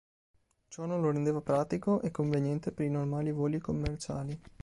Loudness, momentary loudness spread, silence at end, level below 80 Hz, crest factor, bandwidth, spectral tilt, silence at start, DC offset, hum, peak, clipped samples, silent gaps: -33 LUFS; 8 LU; 0.15 s; -52 dBFS; 16 dB; 11.5 kHz; -8 dB/octave; 0.7 s; under 0.1%; none; -18 dBFS; under 0.1%; none